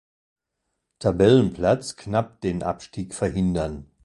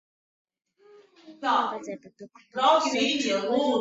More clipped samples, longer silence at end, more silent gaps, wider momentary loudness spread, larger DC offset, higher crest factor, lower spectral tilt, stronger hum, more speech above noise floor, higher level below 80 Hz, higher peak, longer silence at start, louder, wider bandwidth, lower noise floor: neither; first, 0.2 s vs 0 s; neither; second, 13 LU vs 16 LU; neither; about the same, 20 dB vs 20 dB; first, -6.5 dB/octave vs -2.5 dB/octave; neither; first, 57 dB vs 30 dB; first, -44 dBFS vs -74 dBFS; first, -4 dBFS vs -8 dBFS; second, 1 s vs 1.25 s; about the same, -23 LUFS vs -25 LUFS; first, 11.5 kHz vs 8 kHz; first, -79 dBFS vs -56 dBFS